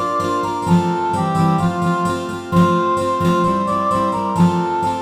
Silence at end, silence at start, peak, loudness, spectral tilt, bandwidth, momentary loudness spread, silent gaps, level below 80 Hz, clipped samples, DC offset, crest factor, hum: 0 s; 0 s; -2 dBFS; -17 LUFS; -7 dB/octave; 13 kHz; 4 LU; none; -48 dBFS; under 0.1%; under 0.1%; 14 dB; none